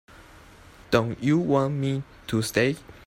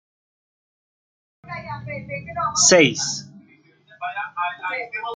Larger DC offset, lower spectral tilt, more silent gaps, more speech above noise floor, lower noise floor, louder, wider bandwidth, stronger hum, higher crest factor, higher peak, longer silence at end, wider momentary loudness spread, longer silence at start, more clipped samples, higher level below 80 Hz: neither; first, -6 dB/octave vs -2 dB/octave; neither; second, 25 dB vs 34 dB; second, -49 dBFS vs -55 dBFS; second, -25 LUFS vs -20 LUFS; first, 16 kHz vs 10.5 kHz; neither; about the same, 20 dB vs 22 dB; second, -6 dBFS vs -2 dBFS; about the same, 0.1 s vs 0 s; second, 7 LU vs 19 LU; second, 0.2 s vs 1.45 s; neither; first, -54 dBFS vs -62 dBFS